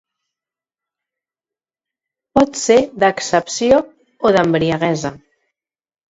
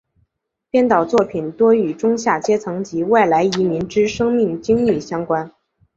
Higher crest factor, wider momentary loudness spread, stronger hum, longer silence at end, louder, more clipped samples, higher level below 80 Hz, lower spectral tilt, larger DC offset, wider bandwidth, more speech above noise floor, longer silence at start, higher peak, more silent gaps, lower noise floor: about the same, 18 dB vs 16 dB; about the same, 6 LU vs 8 LU; neither; first, 0.95 s vs 0.5 s; about the same, -16 LUFS vs -17 LUFS; neither; about the same, -50 dBFS vs -52 dBFS; second, -4.5 dB/octave vs -6 dB/octave; neither; about the same, 8 kHz vs 7.8 kHz; first, over 75 dB vs 54 dB; first, 2.35 s vs 0.75 s; about the same, 0 dBFS vs -2 dBFS; neither; first, under -90 dBFS vs -71 dBFS